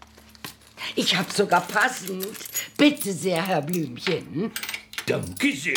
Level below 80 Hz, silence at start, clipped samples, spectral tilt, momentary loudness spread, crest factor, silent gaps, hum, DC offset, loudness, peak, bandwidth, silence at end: -64 dBFS; 0.15 s; under 0.1%; -3.5 dB/octave; 11 LU; 20 dB; none; none; under 0.1%; -24 LUFS; -6 dBFS; over 20 kHz; 0 s